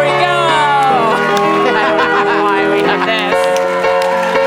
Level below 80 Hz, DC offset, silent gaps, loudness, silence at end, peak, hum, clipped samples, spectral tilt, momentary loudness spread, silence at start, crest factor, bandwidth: -52 dBFS; under 0.1%; none; -12 LUFS; 0 s; -2 dBFS; none; under 0.1%; -4 dB/octave; 2 LU; 0 s; 10 dB; 17 kHz